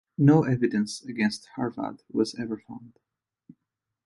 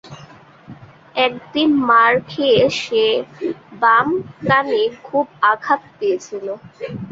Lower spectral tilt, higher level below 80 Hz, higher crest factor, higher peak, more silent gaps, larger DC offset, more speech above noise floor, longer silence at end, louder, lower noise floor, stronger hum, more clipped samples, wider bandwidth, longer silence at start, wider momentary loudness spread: first, -7 dB/octave vs -5 dB/octave; second, -66 dBFS vs -58 dBFS; about the same, 20 dB vs 16 dB; second, -6 dBFS vs -2 dBFS; neither; neither; first, 59 dB vs 26 dB; first, 1.15 s vs 0 s; second, -26 LUFS vs -17 LUFS; first, -84 dBFS vs -43 dBFS; neither; neither; first, 11.5 kHz vs 7.8 kHz; first, 0.2 s vs 0.05 s; about the same, 16 LU vs 14 LU